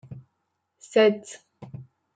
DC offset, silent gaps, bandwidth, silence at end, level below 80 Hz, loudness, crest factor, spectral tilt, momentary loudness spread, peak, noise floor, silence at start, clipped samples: under 0.1%; none; 9.2 kHz; 0.35 s; -70 dBFS; -22 LUFS; 18 dB; -5 dB/octave; 25 LU; -8 dBFS; -77 dBFS; 0.1 s; under 0.1%